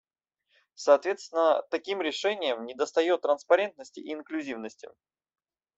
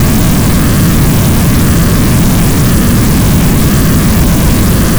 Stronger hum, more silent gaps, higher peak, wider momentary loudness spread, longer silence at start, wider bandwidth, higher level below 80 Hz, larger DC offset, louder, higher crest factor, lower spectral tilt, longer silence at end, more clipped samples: neither; neither; second, -8 dBFS vs 0 dBFS; first, 15 LU vs 0 LU; first, 0.8 s vs 0 s; second, 8 kHz vs over 20 kHz; second, -78 dBFS vs -14 dBFS; neither; second, -27 LUFS vs -8 LUFS; first, 22 dB vs 6 dB; second, -2.5 dB/octave vs -5.5 dB/octave; first, 0.9 s vs 0 s; neither